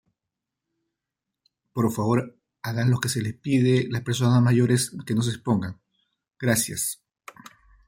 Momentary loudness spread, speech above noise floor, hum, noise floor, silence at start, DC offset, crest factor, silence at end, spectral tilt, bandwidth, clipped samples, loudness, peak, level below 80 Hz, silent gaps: 11 LU; 63 dB; none; -86 dBFS; 1.75 s; under 0.1%; 18 dB; 0.95 s; -5.5 dB/octave; 16.5 kHz; under 0.1%; -24 LUFS; -6 dBFS; -60 dBFS; none